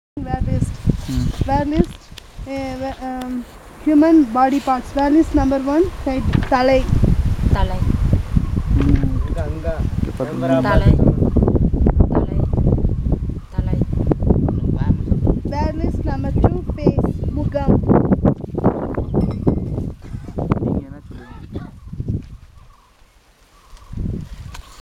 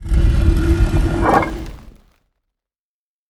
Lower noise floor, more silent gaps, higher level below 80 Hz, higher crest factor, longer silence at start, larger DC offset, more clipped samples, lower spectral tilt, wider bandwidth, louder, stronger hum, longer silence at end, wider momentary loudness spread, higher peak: second, -51 dBFS vs under -90 dBFS; neither; about the same, -24 dBFS vs -20 dBFS; about the same, 18 dB vs 16 dB; first, 0.15 s vs 0 s; neither; neither; about the same, -8.5 dB/octave vs -7.5 dB/octave; about the same, 13 kHz vs 12 kHz; about the same, -19 LUFS vs -17 LUFS; neither; second, 0.2 s vs 1.4 s; about the same, 14 LU vs 12 LU; about the same, 0 dBFS vs 0 dBFS